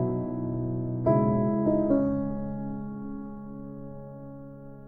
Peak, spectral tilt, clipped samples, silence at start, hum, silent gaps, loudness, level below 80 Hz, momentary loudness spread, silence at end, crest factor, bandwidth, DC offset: -10 dBFS; -13.5 dB/octave; under 0.1%; 0 s; none; none; -28 LUFS; -48 dBFS; 19 LU; 0 s; 18 dB; 2.5 kHz; under 0.1%